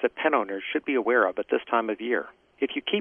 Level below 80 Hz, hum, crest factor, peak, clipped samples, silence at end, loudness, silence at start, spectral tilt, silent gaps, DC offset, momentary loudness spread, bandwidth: -70 dBFS; none; 18 dB; -8 dBFS; under 0.1%; 0 s; -26 LUFS; 0 s; -7 dB/octave; none; under 0.1%; 7 LU; 3.7 kHz